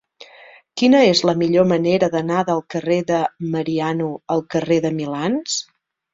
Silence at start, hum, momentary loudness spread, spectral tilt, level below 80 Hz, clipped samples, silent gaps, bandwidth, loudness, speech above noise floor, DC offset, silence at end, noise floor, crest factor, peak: 0.75 s; none; 9 LU; -5 dB/octave; -58 dBFS; under 0.1%; none; 7.8 kHz; -19 LUFS; 28 dB; under 0.1%; 0.5 s; -46 dBFS; 16 dB; -2 dBFS